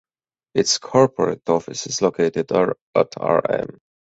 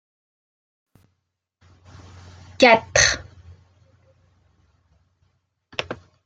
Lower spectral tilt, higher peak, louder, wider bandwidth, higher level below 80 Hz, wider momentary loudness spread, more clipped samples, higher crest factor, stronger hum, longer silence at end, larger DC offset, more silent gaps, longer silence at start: first, -4 dB/octave vs -2 dB/octave; about the same, -2 dBFS vs 0 dBFS; about the same, -20 LUFS vs -18 LUFS; second, 8.2 kHz vs 10 kHz; second, -58 dBFS vs -50 dBFS; second, 8 LU vs 17 LU; neither; second, 20 dB vs 26 dB; neither; about the same, 0.4 s vs 0.3 s; neither; first, 2.81-2.93 s vs none; second, 0.55 s vs 2.6 s